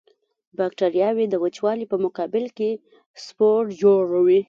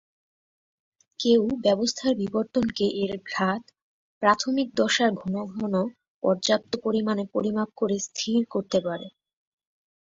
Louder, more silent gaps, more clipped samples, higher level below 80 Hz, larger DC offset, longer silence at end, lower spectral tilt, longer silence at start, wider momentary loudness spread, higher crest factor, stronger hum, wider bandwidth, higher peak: first, -21 LUFS vs -25 LUFS; second, 3.06-3.14 s vs 3.82-4.21 s, 6.08-6.21 s; neither; second, -70 dBFS vs -62 dBFS; neither; second, 0.05 s vs 1.1 s; first, -7 dB/octave vs -4.5 dB/octave; second, 0.6 s vs 1.2 s; first, 11 LU vs 8 LU; second, 16 dB vs 22 dB; neither; about the same, 7.4 kHz vs 7.8 kHz; about the same, -6 dBFS vs -4 dBFS